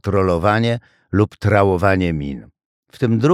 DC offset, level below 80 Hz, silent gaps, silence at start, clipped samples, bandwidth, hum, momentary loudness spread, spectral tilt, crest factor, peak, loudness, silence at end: under 0.1%; -42 dBFS; 2.65-2.83 s; 0.05 s; under 0.1%; 12 kHz; none; 11 LU; -8 dB/octave; 16 dB; -2 dBFS; -18 LUFS; 0 s